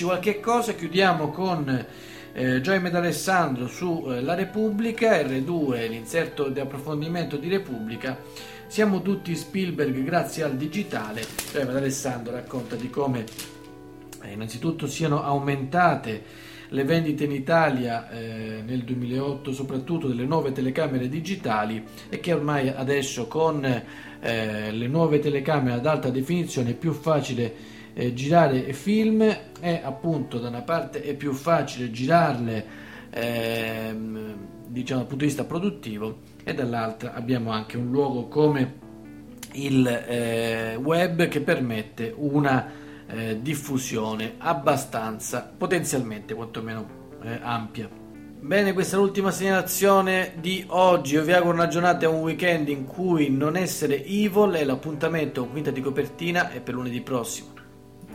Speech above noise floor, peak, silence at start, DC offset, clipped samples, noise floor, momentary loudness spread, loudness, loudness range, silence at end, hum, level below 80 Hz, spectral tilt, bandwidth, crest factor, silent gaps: 22 dB; -4 dBFS; 0 s; under 0.1%; under 0.1%; -46 dBFS; 13 LU; -25 LUFS; 7 LU; 0 s; none; -58 dBFS; -5.5 dB/octave; 16 kHz; 20 dB; none